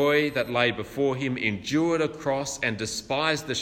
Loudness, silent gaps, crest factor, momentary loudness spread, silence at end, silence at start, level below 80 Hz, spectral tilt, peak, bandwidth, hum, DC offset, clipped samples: -26 LUFS; none; 18 dB; 4 LU; 0 s; 0 s; -56 dBFS; -4 dB/octave; -8 dBFS; 16 kHz; none; under 0.1%; under 0.1%